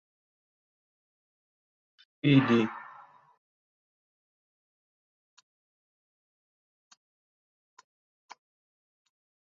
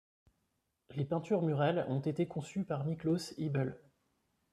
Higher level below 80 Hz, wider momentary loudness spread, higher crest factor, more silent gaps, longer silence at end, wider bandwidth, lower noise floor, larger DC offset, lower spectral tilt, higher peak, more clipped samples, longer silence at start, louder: about the same, -74 dBFS vs -72 dBFS; first, 23 LU vs 7 LU; first, 26 dB vs 18 dB; neither; first, 6.7 s vs 0.75 s; second, 7.2 kHz vs 12.5 kHz; second, -54 dBFS vs -82 dBFS; neither; second, -6 dB/octave vs -7.5 dB/octave; first, -10 dBFS vs -20 dBFS; neither; first, 2.25 s vs 0.9 s; first, -26 LUFS vs -35 LUFS